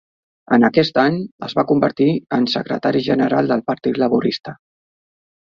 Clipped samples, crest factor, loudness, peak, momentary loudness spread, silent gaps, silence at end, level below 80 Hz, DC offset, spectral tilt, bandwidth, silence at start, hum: under 0.1%; 16 dB; -17 LUFS; -2 dBFS; 8 LU; 1.31-1.39 s; 0.95 s; -58 dBFS; under 0.1%; -7.5 dB/octave; 7 kHz; 0.5 s; none